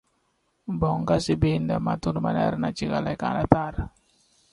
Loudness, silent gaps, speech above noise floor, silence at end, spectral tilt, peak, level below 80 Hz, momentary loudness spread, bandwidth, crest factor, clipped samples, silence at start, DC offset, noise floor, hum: -25 LUFS; none; 46 dB; 0.65 s; -7 dB/octave; 0 dBFS; -42 dBFS; 11 LU; 11.5 kHz; 26 dB; under 0.1%; 0.65 s; under 0.1%; -71 dBFS; none